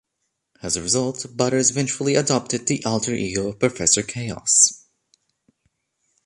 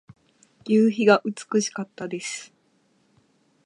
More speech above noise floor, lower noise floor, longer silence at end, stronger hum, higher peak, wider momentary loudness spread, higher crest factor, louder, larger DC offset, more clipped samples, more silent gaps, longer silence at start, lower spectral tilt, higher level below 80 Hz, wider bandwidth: first, 55 dB vs 43 dB; first, -76 dBFS vs -65 dBFS; first, 1.5 s vs 1.2 s; neither; about the same, -2 dBFS vs -4 dBFS; second, 11 LU vs 15 LU; about the same, 22 dB vs 22 dB; first, -20 LUFS vs -23 LUFS; neither; neither; neither; about the same, 0.65 s vs 0.65 s; second, -3 dB/octave vs -4.5 dB/octave; first, -54 dBFS vs -74 dBFS; about the same, 11.5 kHz vs 11 kHz